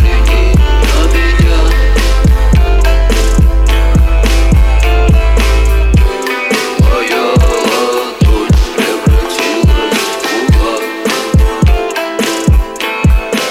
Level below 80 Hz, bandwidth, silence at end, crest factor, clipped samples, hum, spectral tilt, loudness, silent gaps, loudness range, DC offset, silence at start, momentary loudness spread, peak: -10 dBFS; 15.5 kHz; 0 s; 8 dB; under 0.1%; none; -5.5 dB/octave; -11 LUFS; none; 2 LU; under 0.1%; 0 s; 4 LU; -2 dBFS